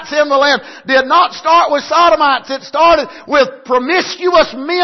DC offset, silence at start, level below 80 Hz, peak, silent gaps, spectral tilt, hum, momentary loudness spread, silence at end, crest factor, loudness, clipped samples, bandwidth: under 0.1%; 0 s; -44 dBFS; 0 dBFS; none; -2.5 dB/octave; none; 5 LU; 0 s; 12 dB; -12 LUFS; under 0.1%; 6.2 kHz